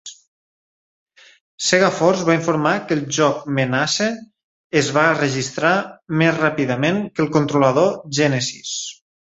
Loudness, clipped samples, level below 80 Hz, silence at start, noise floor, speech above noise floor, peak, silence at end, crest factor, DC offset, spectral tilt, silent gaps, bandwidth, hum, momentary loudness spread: -18 LUFS; under 0.1%; -60 dBFS; 0.05 s; under -90 dBFS; over 72 dB; -2 dBFS; 0.45 s; 18 dB; under 0.1%; -4.5 dB/octave; 0.27-1.06 s, 1.41-1.58 s, 4.44-4.70 s; 8.2 kHz; none; 8 LU